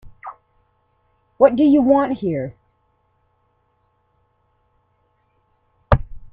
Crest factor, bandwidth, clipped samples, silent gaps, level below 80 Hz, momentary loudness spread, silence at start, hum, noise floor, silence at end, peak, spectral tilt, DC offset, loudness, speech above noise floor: 22 dB; 4.8 kHz; under 0.1%; none; -36 dBFS; 25 LU; 0.05 s; none; -65 dBFS; 0.05 s; 0 dBFS; -11 dB/octave; under 0.1%; -17 LUFS; 50 dB